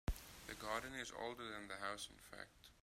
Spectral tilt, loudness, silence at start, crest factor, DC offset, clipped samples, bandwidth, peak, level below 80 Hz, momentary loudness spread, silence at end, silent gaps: -3.5 dB/octave; -49 LUFS; 0.05 s; 20 dB; under 0.1%; under 0.1%; 16 kHz; -30 dBFS; -56 dBFS; 11 LU; 0 s; none